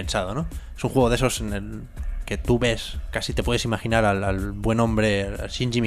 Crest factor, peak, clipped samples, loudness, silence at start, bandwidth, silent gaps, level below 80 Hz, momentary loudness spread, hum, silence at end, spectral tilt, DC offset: 18 dB; -4 dBFS; under 0.1%; -24 LUFS; 0 s; 15 kHz; none; -32 dBFS; 11 LU; none; 0 s; -5.5 dB/octave; under 0.1%